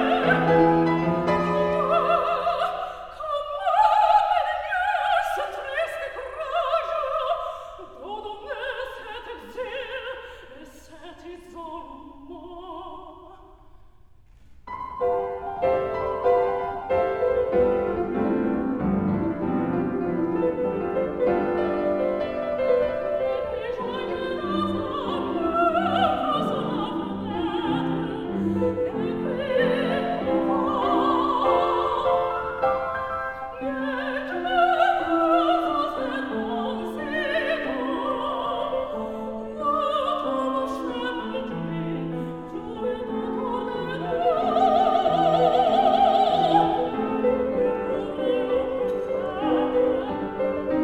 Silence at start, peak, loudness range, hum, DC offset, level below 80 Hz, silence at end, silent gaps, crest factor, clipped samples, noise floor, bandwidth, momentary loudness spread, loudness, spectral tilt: 0 s; -6 dBFS; 12 LU; none; under 0.1%; -50 dBFS; 0 s; none; 18 dB; under 0.1%; -51 dBFS; 13 kHz; 14 LU; -24 LUFS; -7 dB/octave